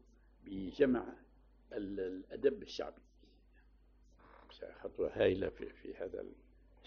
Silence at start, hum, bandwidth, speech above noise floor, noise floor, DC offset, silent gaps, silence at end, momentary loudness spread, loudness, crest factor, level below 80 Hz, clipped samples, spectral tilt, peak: 0.45 s; none; 6.8 kHz; 28 dB; -66 dBFS; under 0.1%; none; 0.5 s; 19 LU; -39 LUFS; 22 dB; -62 dBFS; under 0.1%; -5 dB/octave; -18 dBFS